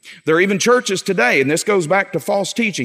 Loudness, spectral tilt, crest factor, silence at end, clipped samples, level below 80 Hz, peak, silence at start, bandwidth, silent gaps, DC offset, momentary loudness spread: -16 LUFS; -4 dB/octave; 14 dB; 0 s; under 0.1%; -70 dBFS; -2 dBFS; 0.05 s; 16 kHz; none; under 0.1%; 5 LU